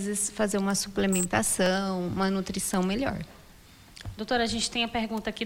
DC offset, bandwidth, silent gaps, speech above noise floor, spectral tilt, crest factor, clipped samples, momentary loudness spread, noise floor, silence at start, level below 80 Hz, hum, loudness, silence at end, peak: under 0.1%; 17.5 kHz; none; 24 dB; -3.5 dB/octave; 16 dB; under 0.1%; 10 LU; -52 dBFS; 0 s; -50 dBFS; none; -27 LUFS; 0 s; -12 dBFS